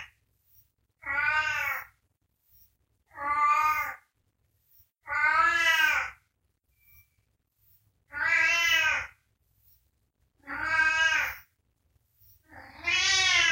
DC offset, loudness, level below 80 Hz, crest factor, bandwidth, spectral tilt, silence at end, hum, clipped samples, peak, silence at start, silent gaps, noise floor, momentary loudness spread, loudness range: under 0.1%; -25 LUFS; -60 dBFS; 18 dB; 16 kHz; 0.5 dB/octave; 0 s; none; under 0.1%; -12 dBFS; 0 s; none; -75 dBFS; 15 LU; 5 LU